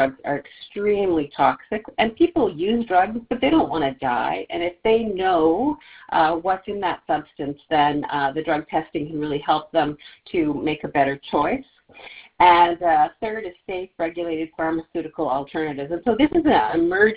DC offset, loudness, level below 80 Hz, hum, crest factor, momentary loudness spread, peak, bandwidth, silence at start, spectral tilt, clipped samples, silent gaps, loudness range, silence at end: under 0.1%; -22 LUFS; -52 dBFS; none; 18 dB; 10 LU; -2 dBFS; 4 kHz; 0 s; -9.5 dB/octave; under 0.1%; none; 3 LU; 0 s